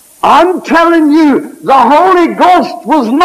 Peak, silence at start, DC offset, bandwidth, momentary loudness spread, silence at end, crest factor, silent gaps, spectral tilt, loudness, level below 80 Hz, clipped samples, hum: 0 dBFS; 0.25 s; under 0.1%; 15 kHz; 5 LU; 0 s; 8 dB; none; -5 dB/octave; -7 LUFS; -48 dBFS; 0.4%; none